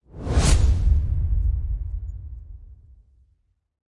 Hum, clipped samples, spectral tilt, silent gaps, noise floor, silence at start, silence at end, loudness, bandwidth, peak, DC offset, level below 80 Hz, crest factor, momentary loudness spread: none; under 0.1%; -5.5 dB/octave; none; -66 dBFS; 0.15 s; 1.25 s; -23 LUFS; 11.5 kHz; -6 dBFS; under 0.1%; -24 dBFS; 18 dB; 20 LU